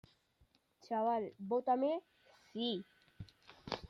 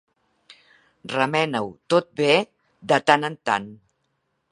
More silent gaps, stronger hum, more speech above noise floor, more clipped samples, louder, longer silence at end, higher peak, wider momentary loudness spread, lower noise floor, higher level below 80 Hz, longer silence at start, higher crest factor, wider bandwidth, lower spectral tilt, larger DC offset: neither; neither; second, 37 dB vs 51 dB; neither; second, -38 LUFS vs -22 LUFS; second, 0.05 s vs 0.75 s; second, -18 dBFS vs 0 dBFS; first, 22 LU vs 18 LU; about the same, -74 dBFS vs -73 dBFS; about the same, -70 dBFS vs -68 dBFS; second, 0.85 s vs 1.05 s; about the same, 22 dB vs 24 dB; about the same, 11.5 kHz vs 11 kHz; first, -6.5 dB/octave vs -4.5 dB/octave; neither